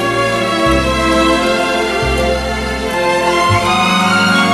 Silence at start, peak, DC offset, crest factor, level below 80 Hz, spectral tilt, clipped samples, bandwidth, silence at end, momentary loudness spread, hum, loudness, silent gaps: 0 s; -2 dBFS; under 0.1%; 12 dB; -28 dBFS; -4.5 dB/octave; under 0.1%; 13 kHz; 0 s; 5 LU; none; -13 LUFS; none